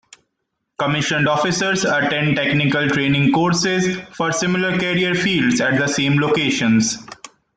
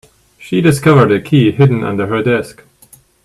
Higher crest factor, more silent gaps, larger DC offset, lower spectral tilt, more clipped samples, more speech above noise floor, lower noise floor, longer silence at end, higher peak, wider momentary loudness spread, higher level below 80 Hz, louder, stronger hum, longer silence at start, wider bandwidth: about the same, 14 dB vs 12 dB; neither; neither; second, -4.5 dB/octave vs -7 dB/octave; neither; first, 58 dB vs 35 dB; first, -75 dBFS vs -46 dBFS; second, 0.3 s vs 0.75 s; second, -6 dBFS vs 0 dBFS; second, 5 LU vs 8 LU; second, -52 dBFS vs -46 dBFS; second, -17 LUFS vs -12 LUFS; neither; first, 0.8 s vs 0.4 s; second, 9.4 kHz vs 13 kHz